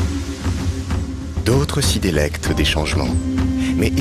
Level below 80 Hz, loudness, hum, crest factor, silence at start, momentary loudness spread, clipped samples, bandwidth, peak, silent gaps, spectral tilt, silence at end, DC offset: -26 dBFS; -19 LUFS; none; 16 dB; 0 s; 6 LU; under 0.1%; 15 kHz; -2 dBFS; none; -5 dB/octave; 0 s; under 0.1%